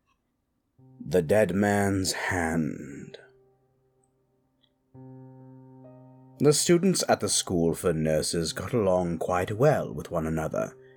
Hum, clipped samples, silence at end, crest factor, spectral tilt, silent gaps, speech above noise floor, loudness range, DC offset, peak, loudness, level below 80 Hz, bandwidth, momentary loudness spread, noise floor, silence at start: none; under 0.1%; 0.2 s; 18 dB; -4.5 dB/octave; none; 51 dB; 9 LU; under 0.1%; -10 dBFS; -26 LUFS; -54 dBFS; 19.5 kHz; 11 LU; -76 dBFS; 1 s